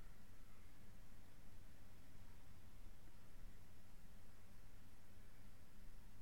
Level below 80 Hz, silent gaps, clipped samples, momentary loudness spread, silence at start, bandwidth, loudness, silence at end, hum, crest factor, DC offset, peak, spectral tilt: -62 dBFS; none; under 0.1%; 2 LU; 0 s; 16.5 kHz; -67 LUFS; 0 s; none; 14 dB; 0.3%; -42 dBFS; -5 dB/octave